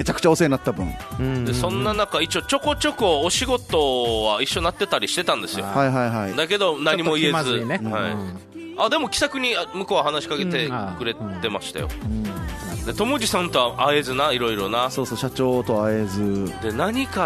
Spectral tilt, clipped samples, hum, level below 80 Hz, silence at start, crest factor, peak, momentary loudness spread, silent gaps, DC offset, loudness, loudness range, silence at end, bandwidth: -4 dB/octave; under 0.1%; none; -40 dBFS; 0 s; 18 dB; -4 dBFS; 8 LU; none; under 0.1%; -22 LUFS; 4 LU; 0 s; 13.5 kHz